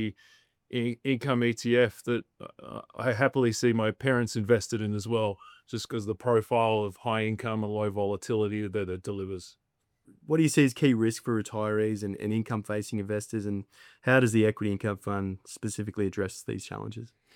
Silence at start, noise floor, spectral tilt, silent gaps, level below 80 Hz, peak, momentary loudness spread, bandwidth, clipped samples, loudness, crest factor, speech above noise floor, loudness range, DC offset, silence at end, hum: 0 s; -66 dBFS; -6 dB/octave; none; -68 dBFS; -10 dBFS; 12 LU; 18 kHz; under 0.1%; -29 LUFS; 20 dB; 37 dB; 3 LU; under 0.1%; 0.3 s; none